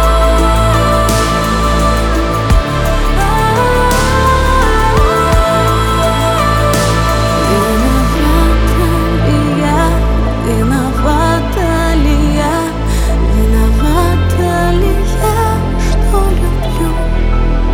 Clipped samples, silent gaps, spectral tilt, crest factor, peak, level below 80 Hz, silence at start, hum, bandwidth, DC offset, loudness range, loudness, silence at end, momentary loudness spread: under 0.1%; none; -5.5 dB/octave; 10 dB; 0 dBFS; -14 dBFS; 0 s; none; 19 kHz; under 0.1%; 2 LU; -12 LUFS; 0 s; 4 LU